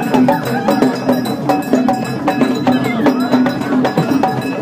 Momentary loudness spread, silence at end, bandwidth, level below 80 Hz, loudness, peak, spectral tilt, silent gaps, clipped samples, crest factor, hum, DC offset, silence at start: 3 LU; 0 s; 16 kHz; -52 dBFS; -15 LUFS; 0 dBFS; -6.5 dB/octave; none; under 0.1%; 14 dB; none; under 0.1%; 0 s